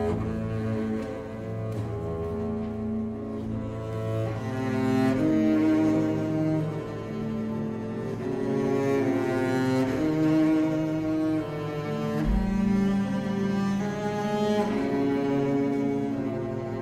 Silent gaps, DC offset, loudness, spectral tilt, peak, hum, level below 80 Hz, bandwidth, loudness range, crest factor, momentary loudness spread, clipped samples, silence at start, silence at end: none; under 0.1%; -27 LUFS; -8 dB/octave; -14 dBFS; none; -44 dBFS; 14 kHz; 6 LU; 14 dB; 9 LU; under 0.1%; 0 s; 0 s